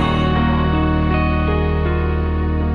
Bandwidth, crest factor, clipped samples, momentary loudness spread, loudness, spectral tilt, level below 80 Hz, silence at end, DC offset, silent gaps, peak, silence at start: 5 kHz; 10 dB; under 0.1%; 3 LU; -18 LUFS; -9 dB/octave; -22 dBFS; 0 s; under 0.1%; none; -6 dBFS; 0 s